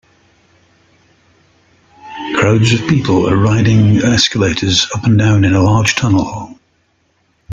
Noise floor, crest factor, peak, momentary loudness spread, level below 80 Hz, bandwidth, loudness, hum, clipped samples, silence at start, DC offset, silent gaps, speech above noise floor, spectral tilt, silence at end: -59 dBFS; 14 dB; 0 dBFS; 10 LU; -40 dBFS; 7.8 kHz; -12 LUFS; none; under 0.1%; 2.05 s; under 0.1%; none; 48 dB; -5.5 dB/octave; 0 s